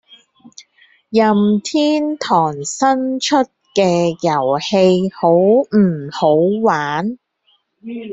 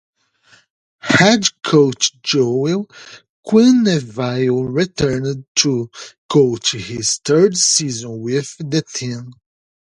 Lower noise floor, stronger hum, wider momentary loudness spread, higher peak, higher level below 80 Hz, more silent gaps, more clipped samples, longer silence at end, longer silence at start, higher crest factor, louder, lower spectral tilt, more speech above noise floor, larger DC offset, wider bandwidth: first, -61 dBFS vs -53 dBFS; neither; second, 7 LU vs 13 LU; about the same, -2 dBFS vs 0 dBFS; second, -60 dBFS vs -52 dBFS; second, none vs 3.29-3.43 s, 5.48-5.55 s, 6.18-6.29 s; neither; second, 0 s vs 0.5 s; second, 0.6 s vs 1.05 s; about the same, 14 dB vs 18 dB; about the same, -15 LUFS vs -16 LUFS; first, -5.5 dB/octave vs -4 dB/octave; first, 46 dB vs 37 dB; neither; second, 8 kHz vs 11 kHz